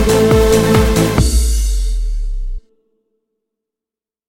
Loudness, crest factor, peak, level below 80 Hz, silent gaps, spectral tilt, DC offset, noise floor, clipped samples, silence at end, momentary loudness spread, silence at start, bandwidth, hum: -14 LUFS; 14 dB; 0 dBFS; -18 dBFS; none; -5.5 dB/octave; under 0.1%; -88 dBFS; under 0.1%; 1.7 s; 16 LU; 0 s; 17 kHz; none